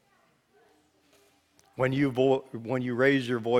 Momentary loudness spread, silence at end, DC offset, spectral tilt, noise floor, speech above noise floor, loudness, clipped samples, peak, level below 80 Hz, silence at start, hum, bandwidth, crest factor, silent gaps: 8 LU; 0 s; under 0.1%; -7 dB/octave; -67 dBFS; 41 dB; -27 LUFS; under 0.1%; -10 dBFS; -66 dBFS; 1.8 s; none; 12.5 kHz; 20 dB; none